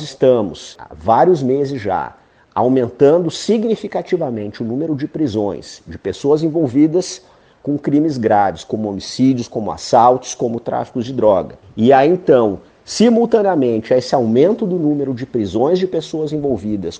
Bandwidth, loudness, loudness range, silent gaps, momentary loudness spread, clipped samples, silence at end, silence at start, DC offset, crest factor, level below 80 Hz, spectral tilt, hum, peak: 9.6 kHz; -16 LUFS; 4 LU; none; 11 LU; under 0.1%; 0 s; 0 s; under 0.1%; 16 dB; -50 dBFS; -6.5 dB/octave; none; 0 dBFS